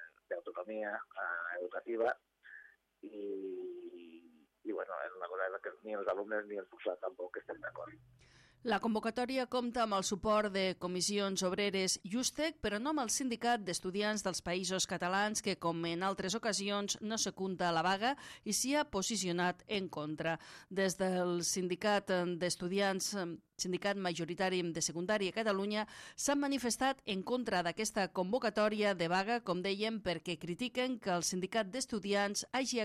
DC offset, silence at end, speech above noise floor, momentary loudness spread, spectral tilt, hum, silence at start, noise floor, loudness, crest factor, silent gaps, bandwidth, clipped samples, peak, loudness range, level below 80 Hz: under 0.1%; 0 s; 28 dB; 10 LU; -3.5 dB/octave; none; 0 s; -65 dBFS; -36 LUFS; 16 dB; none; 15 kHz; under 0.1%; -20 dBFS; 7 LU; -68 dBFS